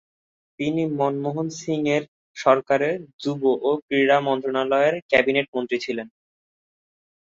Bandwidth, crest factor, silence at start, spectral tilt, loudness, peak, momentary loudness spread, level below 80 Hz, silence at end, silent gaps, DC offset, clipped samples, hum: 7.6 kHz; 20 dB; 0.6 s; -5.5 dB/octave; -22 LUFS; -2 dBFS; 10 LU; -64 dBFS; 1.15 s; 2.08-2.34 s, 3.13-3.19 s, 3.82-3.88 s, 5.02-5.09 s, 5.48-5.53 s; under 0.1%; under 0.1%; none